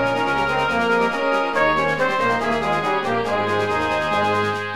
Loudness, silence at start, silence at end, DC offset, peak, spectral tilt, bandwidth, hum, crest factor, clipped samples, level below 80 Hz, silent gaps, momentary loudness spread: -20 LUFS; 0 s; 0 s; 0.7%; -6 dBFS; -5 dB/octave; over 20 kHz; none; 14 dB; under 0.1%; -48 dBFS; none; 2 LU